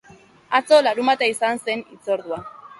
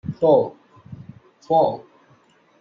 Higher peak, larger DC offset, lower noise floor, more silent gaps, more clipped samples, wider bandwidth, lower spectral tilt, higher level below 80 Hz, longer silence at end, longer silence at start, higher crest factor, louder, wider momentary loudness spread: about the same, -2 dBFS vs -4 dBFS; neither; second, -48 dBFS vs -56 dBFS; neither; neither; first, 11.5 kHz vs 7 kHz; second, -2.5 dB/octave vs -9 dB/octave; about the same, -66 dBFS vs -62 dBFS; second, 0.15 s vs 0.8 s; first, 0.5 s vs 0.05 s; about the same, 18 dB vs 18 dB; about the same, -20 LUFS vs -19 LUFS; second, 12 LU vs 24 LU